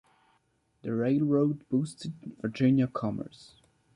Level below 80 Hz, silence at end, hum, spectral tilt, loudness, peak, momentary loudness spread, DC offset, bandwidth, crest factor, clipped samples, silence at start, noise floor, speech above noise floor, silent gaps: -66 dBFS; 0.65 s; none; -8 dB/octave; -29 LUFS; -14 dBFS; 15 LU; under 0.1%; 11 kHz; 16 dB; under 0.1%; 0.85 s; -71 dBFS; 43 dB; none